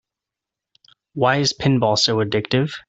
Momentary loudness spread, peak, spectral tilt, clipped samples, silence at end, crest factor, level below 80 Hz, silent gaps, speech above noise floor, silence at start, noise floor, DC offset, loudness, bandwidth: 5 LU; -4 dBFS; -4.5 dB/octave; under 0.1%; 0.1 s; 18 dB; -54 dBFS; none; 68 dB; 1.15 s; -86 dBFS; under 0.1%; -18 LUFS; 8.2 kHz